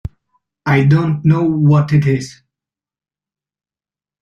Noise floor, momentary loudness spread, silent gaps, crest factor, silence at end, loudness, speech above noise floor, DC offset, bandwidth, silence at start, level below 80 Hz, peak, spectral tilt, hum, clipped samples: under -90 dBFS; 13 LU; none; 14 dB; 1.9 s; -14 LUFS; over 78 dB; under 0.1%; 7.6 kHz; 0.65 s; -46 dBFS; -2 dBFS; -8 dB/octave; none; under 0.1%